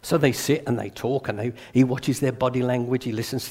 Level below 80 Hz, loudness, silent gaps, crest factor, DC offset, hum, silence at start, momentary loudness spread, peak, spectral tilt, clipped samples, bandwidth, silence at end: -56 dBFS; -24 LUFS; none; 18 dB; under 0.1%; none; 0.05 s; 7 LU; -6 dBFS; -6 dB/octave; under 0.1%; 16 kHz; 0 s